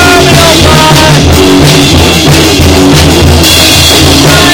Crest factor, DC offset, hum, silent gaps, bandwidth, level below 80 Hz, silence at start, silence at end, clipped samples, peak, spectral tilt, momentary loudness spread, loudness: 2 dB; 0.5%; none; none; over 20 kHz; -14 dBFS; 0 s; 0 s; 20%; 0 dBFS; -4 dB/octave; 2 LU; -2 LUFS